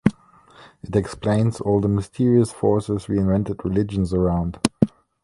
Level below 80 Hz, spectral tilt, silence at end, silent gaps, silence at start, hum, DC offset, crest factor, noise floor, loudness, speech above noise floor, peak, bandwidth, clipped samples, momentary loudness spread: -40 dBFS; -7.5 dB/octave; 0.35 s; none; 0.05 s; none; under 0.1%; 20 dB; -51 dBFS; -22 LUFS; 30 dB; 0 dBFS; 11.5 kHz; under 0.1%; 6 LU